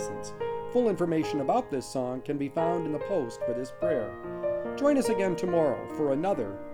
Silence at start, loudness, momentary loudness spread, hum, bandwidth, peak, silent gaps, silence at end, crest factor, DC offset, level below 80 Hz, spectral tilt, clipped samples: 0 s; -29 LUFS; 7 LU; none; 18 kHz; -14 dBFS; none; 0 s; 16 dB; under 0.1%; -58 dBFS; -6.5 dB/octave; under 0.1%